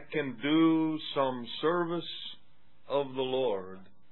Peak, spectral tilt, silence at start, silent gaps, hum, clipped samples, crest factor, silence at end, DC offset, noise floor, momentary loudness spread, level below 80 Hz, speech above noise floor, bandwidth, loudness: -14 dBFS; -9 dB/octave; 0 s; none; none; under 0.1%; 16 dB; 0.3 s; 0.5%; -67 dBFS; 13 LU; -76 dBFS; 37 dB; 4.2 kHz; -31 LUFS